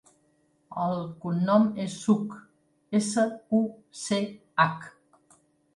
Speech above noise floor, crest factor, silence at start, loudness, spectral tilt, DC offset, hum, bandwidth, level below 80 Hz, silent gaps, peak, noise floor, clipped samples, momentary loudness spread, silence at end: 41 dB; 20 dB; 0.7 s; -27 LUFS; -5.5 dB/octave; under 0.1%; none; 11.5 kHz; -72 dBFS; none; -8 dBFS; -68 dBFS; under 0.1%; 15 LU; 0.85 s